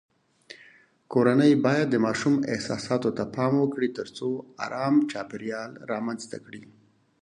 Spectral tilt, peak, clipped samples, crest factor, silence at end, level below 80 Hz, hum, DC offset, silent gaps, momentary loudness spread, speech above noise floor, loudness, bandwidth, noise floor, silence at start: -6.5 dB/octave; -6 dBFS; under 0.1%; 20 dB; 0.6 s; -66 dBFS; none; under 0.1%; none; 16 LU; 31 dB; -26 LUFS; 10 kHz; -56 dBFS; 0.5 s